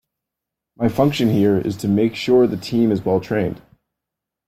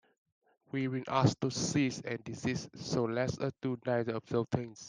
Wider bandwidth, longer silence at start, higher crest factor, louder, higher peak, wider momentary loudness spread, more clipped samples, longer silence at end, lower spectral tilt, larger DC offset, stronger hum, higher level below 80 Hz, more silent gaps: first, 15.5 kHz vs 10 kHz; about the same, 0.8 s vs 0.75 s; about the same, 16 dB vs 20 dB; first, -18 LUFS vs -34 LUFS; first, -4 dBFS vs -14 dBFS; about the same, 6 LU vs 7 LU; neither; first, 0.9 s vs 0 s; first, -7 dB/octave vs -5.5 dB/octave; neither; neither; first, -52 dBFS vs -66 dBFS; neither